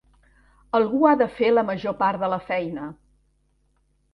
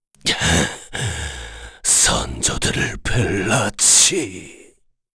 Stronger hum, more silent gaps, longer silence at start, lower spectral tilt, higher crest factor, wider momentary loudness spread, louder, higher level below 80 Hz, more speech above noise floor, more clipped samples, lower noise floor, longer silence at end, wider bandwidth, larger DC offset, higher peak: neither; neither; first, 0.75 s vs 0.25 s; first, -8 dB/octave vs -2 dB/octave; about the same, 18 dB vs 18 dB; second, 12 LU vs 17 LU; second, -22 LUFS vs -16 LUFS; second, -58 dBFS vs -34 dBFS; first, 45 dB vs 35 dB; neither; first, -66 dBFS vs -54 dBFS; first, 1.2 s vs 0.6 s; second, 5.8 kHz vs 11 kHz; neither; second, -6 dBFS vs -2 dBFS